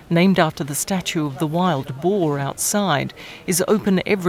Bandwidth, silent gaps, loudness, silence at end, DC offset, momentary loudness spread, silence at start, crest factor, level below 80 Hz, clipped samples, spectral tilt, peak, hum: 16 kHz; none; -20 LUFS; 0 s; under 0.1%; 6 LU; 0 s; 18 dB; -52 dBFS; under 0.1%; -4.5 dB/octave; -2 dBFS; none